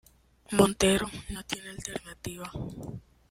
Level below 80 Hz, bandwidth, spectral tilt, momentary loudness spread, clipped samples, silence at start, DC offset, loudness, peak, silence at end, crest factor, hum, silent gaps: -50 dBFS; 16 kHz; -4 dB/octave; 18 LU; under 0.1%; 0.5 s; under 0.1%; -30 LUFS; -6 dBFS; 0.3 s; 24 dB; none; none